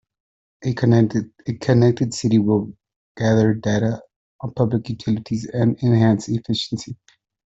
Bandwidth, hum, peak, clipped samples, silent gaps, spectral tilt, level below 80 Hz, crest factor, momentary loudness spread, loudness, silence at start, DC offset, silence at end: 8 kHz; none; -4 dBFS; under 0.1%; 2.96-3.15 s, 4.16-4.39 s; -7 dB/octave; -52 dBFS; 16 dB; 13 LU; -20 LUFS; 0.6 s; under 0.1%; 0.65 s